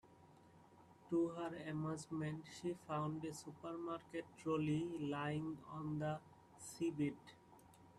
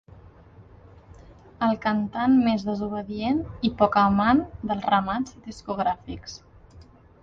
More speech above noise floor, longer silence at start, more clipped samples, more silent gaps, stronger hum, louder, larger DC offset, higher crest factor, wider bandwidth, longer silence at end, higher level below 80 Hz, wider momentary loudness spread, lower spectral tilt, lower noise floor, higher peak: second, 22 dB vs 26 dB; about the same, 0.05 s vs 0.15 s; neither; neither; neither; second, -44 LUFS vs -24 LUFS; neither; about the same, 16 dB vs 20 dB; first, 13.5 kHz vs 7.6 kHz; second, 0 s vs 0.4 s; second, -78 dBFS vs -50 dBFS; second, 11 LU vs 14 LU; about the same, -6.5 dB/octave vs -6.5 dB/octave; first, -66 dBFS vs -50 dBFS; second, -28 dBFS vs -6 dBFS